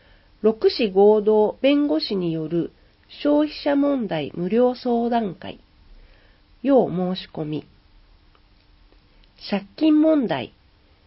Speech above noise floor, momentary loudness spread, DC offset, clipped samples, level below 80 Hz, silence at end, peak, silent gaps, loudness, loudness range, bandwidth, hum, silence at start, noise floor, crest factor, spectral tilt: 36 dB; 13 LU; under 0.1%; under 0.1%; -54 dBFS; 0.6 s; -6 dBFS; none; -21 LUFS; 6 LU; 5.8 kHz; none; 0.45 s; -56 dBFS; 16 dB; -11 dB/octave